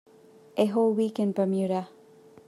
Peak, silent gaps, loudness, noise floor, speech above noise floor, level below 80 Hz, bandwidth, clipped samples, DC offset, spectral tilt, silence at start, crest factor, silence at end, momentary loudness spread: -10 dBFS; none; -27 LUFS; -54 dBFS; 29 dB; -80 dBFS; 12.5 kHz; under 0.1%; under 0.1%; -7.5 dB/octave; 0.55 s; 18 dB; 0.6 s; 10 LU